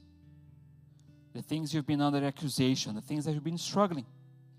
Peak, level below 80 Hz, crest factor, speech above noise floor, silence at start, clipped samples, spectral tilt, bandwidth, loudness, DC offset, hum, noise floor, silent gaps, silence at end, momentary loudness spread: -14 dBFS; -74 dBFS; 20 dB; 27 dB; 0.25 s; under 0.1%; -5.5 dB/octave; 15.5 kHz; -32 LUFS; under 0.1%; none; -58 dBFS; none; 0.35 s; 11 LU